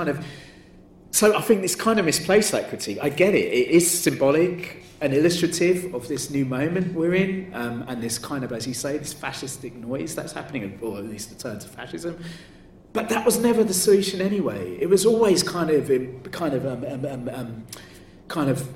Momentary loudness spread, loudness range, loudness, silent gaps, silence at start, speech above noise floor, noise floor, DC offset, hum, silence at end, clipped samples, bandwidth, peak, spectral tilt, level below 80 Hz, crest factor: 15 LU; 10 LU; -23 LUFS; none; 0 s; 26 dB; -48 dBFS; under 0.1%; none; 0 s; under 0.1%; 16.5 kHz; -6 dBFS; -4.5 dB/octave; -56 dBFS; 18 dB